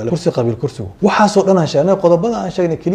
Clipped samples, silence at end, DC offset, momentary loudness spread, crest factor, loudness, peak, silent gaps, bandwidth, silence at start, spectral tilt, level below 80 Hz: under 0.1%; 0 s; under 0.1%; 7 LU; 14 dB; -14 LUFS; 0 dBFS; none; 10.5 kHz; 0 s; -6.5 dB/octave; -46 dBFS